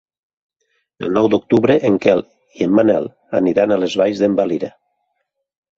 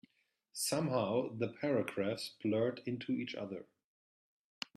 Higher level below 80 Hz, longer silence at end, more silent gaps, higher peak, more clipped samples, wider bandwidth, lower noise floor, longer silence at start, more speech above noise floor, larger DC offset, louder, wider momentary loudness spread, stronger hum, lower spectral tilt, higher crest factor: first, -56 dBFS vs -80 dBFS; about the same, 1.1 s vs 1.1 s; neither; first, 0 dBFS vs -18 dBFS; neither; second, 7.8 kHz vs 13.5 kHz; second, -73 dBFS vs -77 dBFS; first, 1 s vs 0.55 s; first, 57 dB vs 41 dB; neither; first, -16 LUFS vs -37 LUFS; second, 8 LU vs 11 LU; neither; first, -7 dB/octave vs -5 dB/octave; about the same, 16 dB vs 20 dB